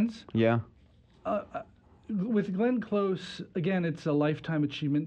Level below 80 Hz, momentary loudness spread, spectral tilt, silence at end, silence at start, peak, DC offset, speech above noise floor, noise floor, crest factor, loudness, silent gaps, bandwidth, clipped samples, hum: -64 dBFS; 9 LU; -8 dB/octave; 0 s; 0 s; -12 dBFS; under 0.1%; 31 dB; -60 dBFS; 18 dB; -30 LUFS; none; 8.8 kHz; under 0.1%; none